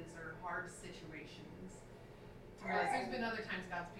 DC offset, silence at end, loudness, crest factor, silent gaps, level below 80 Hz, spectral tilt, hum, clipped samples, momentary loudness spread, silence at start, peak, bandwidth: under 0.1%; 0 s; -42 LUFS; 20 dB; none; -64 dBFS; -4.5 dB/octave; none; under 0.1%; 19 LU; 0 s; -24 dBFS; 16 kHz